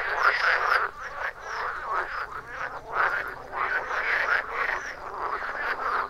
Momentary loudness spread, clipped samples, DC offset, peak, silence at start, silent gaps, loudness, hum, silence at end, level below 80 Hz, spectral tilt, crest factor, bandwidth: 11 LU; under 0.1%; under 0.1%; -8 dBFS; 0 s; none; -27 LUFS; none; 0 s; -54 dBFS; -2.5 dB/octave; 20 dB; 15.5 kHz